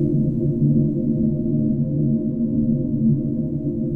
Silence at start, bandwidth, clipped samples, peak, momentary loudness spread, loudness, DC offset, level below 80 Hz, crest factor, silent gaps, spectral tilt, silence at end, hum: 0 s; 1.1 kHz; under 0.1%; -8 dBFS; 4 LU; -21 LUFS; under 0.1%; -38 dBFS; 12 dB; none; -14.5 dB/octave; 0 s; none